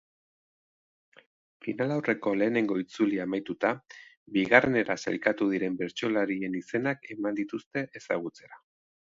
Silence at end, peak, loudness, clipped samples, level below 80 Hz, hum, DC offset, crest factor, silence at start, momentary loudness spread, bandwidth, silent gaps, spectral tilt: 0.6 s; -4 dBFS; -29 LUFS; under 0.1%; -70 dBFS; none; under 0.1%; 26 dB; 1.65 s; 10 LU; 7.6 kHz; 4.17-4.26 s, 7.66-7.71 s; -6 dB/octave